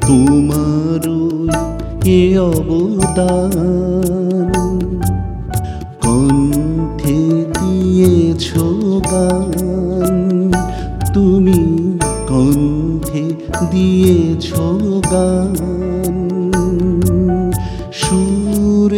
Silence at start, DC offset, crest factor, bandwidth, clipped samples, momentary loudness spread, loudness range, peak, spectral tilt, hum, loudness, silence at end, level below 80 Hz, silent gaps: 0 s; under 0.1%; 14 dB; 16.5 kHz; under 0.1%; 8 LU; 2 LU; 0 dBFS; -6.5 dB/octave; none; -14 LUFS; 0 s; -28 dBFS; none